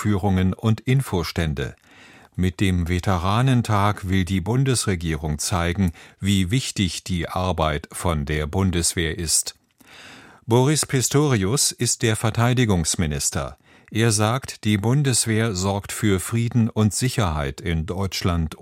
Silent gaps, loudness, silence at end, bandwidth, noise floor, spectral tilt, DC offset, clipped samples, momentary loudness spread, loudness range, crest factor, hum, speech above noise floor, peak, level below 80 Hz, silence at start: none; -22 LUFS; 0.05 s; 16 kHz; -49 dBFS; -4.5 dB/octave; under 0.1%; under 0.1%; 7 LU; 3 LU; 18 dB; none; 27 dB; -4 dBFS; -38 dBFS; 0 s